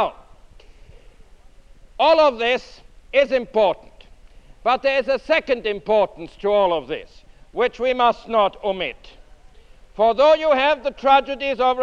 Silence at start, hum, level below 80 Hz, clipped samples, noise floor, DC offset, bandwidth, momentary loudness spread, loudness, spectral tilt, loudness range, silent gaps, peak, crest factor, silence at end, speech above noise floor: 0 s; none; -48 dBFS; under 0.1%; -46 dBFS; under 0.1%; 7.6 kHz; 10 LU; -19 LUFS; -4.5 dB/octave; 3 LU; none; -2 dBFS; 18 dB; 0 s; 27 dB